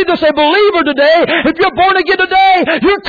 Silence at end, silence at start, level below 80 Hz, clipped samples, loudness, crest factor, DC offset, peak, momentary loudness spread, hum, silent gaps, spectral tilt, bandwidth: 0 s; 0 s; -42 dBFS; under 0.1%; -9 LUFS; 8 dB; under 0.1%; -2 dBFS; 3 LU; none; none; -5.5 dB/octave; 5 kHz